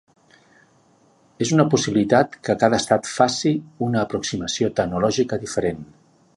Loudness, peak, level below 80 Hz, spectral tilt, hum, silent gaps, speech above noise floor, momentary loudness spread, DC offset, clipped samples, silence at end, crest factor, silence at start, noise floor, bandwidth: -21 LUFS; -2 dBFS; -52 dBFS; -5 dB/octave; none; none; 37 dB; 7 LU; under 0.1%; under 0.1%; 0.5 s; 20 dB; 1.4 s; -57 dBFS; 11.5 kHz